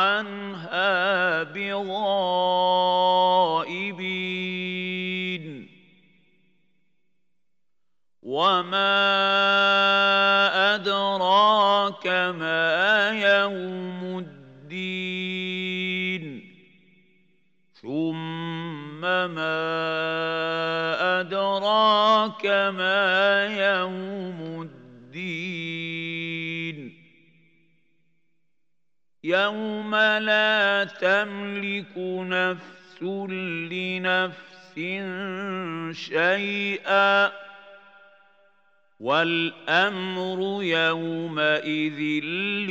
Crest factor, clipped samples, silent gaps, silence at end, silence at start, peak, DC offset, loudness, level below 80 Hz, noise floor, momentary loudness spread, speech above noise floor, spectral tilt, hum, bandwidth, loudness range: 18 dB; under 0.1%; none; 0 s; 0 s; -6 dBFS; under 0.1%; -23 LUFS; -84 dBFS; -86 dBFS; 14 LU; 62 dB; -5 dB/octave; none; 8 kHz; 12 LU